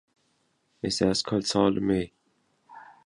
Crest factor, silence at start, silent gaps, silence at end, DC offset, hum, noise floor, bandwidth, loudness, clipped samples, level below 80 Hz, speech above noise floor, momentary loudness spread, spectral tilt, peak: 22 dB; 0.85 s; none; 0.2 s; under 0.1%; none; -71 dBFS; 11.5 kHz; -26 LUFS; under 0.1%; -54 dBFS; 46 dB; 9 LU; -5 dB/octave; -8 dBFS